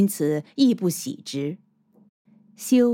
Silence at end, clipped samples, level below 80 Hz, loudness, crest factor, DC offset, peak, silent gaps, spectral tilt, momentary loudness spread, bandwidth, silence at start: 0 s; under 0.1%; -80 dBFS; -24 LUFS; 16 dB; under 0.1%; -8 dBFS; 2.09-2.25 s; -5.5 dB/octave; 13 LU; 17 kHz; 0 s